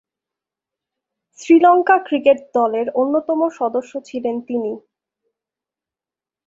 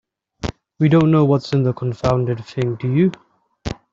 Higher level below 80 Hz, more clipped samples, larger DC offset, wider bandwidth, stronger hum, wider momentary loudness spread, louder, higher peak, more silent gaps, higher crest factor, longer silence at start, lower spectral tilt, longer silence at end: second, -70 dBFS vs -42 dBFS; neither; neither; about the same, 7.8 kHz vs 7.6 kHz; neither; about the same, 14 LU vs 16 LU; about the same, -17 LUFS vs -18 LUFS; about the same, -2 dBFS vs -4 dBFS; neither; about the same, 18 dB vs 16 dB; first, 1.4 s vs 0.45 s; second, -5 dB/octave vs -8.5 dB/octave; first, 1.65 s vs 0.2 s